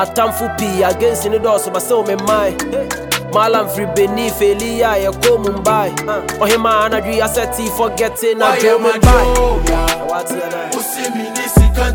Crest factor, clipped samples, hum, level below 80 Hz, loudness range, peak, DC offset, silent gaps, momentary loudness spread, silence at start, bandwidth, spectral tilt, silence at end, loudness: 14 dB; under 0.1%; none; -22 dBFS; 2 LU; 0 dBFS; under 0.1%; none; 8 LU; 0 s; 19.5 kHz; -4.5 dB/octave; 0 s; -15 LUFS